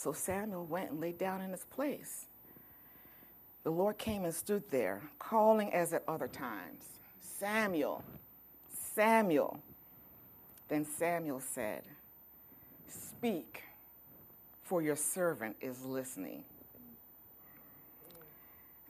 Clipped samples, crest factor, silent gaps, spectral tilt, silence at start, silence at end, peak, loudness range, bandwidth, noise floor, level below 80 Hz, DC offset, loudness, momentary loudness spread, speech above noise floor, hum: under 0.1%; 24 dB; none; -4.5 dB/octave; 0 s; 0 s; -14 dBFS; 8 LU; 15.5 kHz; -59 dBFS; -72 dBFS; under 0.1%; -36 LUFS; 23 LU; 23 dB; none